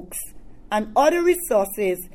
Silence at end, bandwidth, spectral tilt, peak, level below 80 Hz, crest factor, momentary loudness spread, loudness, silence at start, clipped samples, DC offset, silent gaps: 0 s; 19.5 kHz; -4 dB/octave; -4 dBFS; -46 dBFS; 18 dB; 15 LU; -21 LUFS; 0 s; under 0.1%; under 0.1%; none